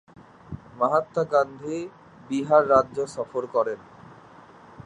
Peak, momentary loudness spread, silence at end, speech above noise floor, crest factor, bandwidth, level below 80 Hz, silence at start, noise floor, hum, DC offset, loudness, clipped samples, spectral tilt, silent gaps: -6 dBFS; 19 LU; 0.05 s; 25 dB; 20 dB; 10.5 kHz; -58 dBFS; 0.5 s; -49 dBFS; none; under 0.1%; -24 LUFS; under 0.1%; -6.5 dB/octave; none